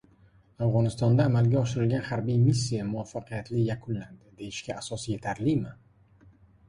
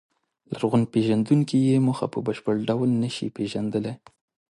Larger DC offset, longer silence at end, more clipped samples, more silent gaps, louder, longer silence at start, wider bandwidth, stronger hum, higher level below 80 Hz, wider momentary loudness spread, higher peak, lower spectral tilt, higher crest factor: neither; first, 0.95 s vs 0.6 s; neither; neither; second, -28 LUFS vs -24 LUFS; about the same, 0.6 s vs 0.5 s; about the same, 11.5 kHz vs 11.5 kHz; neither; first, -54 dBFS vs -62 dBFS; first, 13 LU vs 9 LU; about the same, -10 dBFS vs -8 dBFS; about the same, -7 dB/octave vs -7.5 dB/octave; about the same, 18 dB vs 16 dB